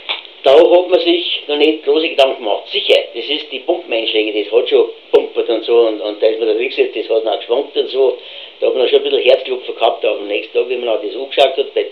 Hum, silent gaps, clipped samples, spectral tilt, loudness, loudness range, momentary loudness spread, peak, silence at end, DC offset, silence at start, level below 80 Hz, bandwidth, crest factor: none; none; under 0.1%; -3.5 dB/octave; -14 LUFS; 3 LU; 7 LU; 0 dBFS; 0 s; 0.2%; 0 s; -68 dBFS; 8.6 kHz; 14 dB